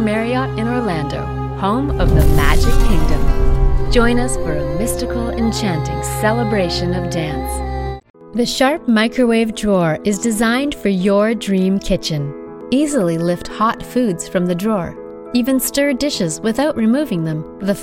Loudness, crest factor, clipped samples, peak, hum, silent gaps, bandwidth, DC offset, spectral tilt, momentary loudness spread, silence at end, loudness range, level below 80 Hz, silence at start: -17 LUFS; 16 dB; under 0.1%; 0 dBFS; none; 8.10-8.14 s; 16.5 kHz; under 0.1%; -5.5 dB/octave; 7 LU; 0 s; 3 LU; -22 dBFS; 0 s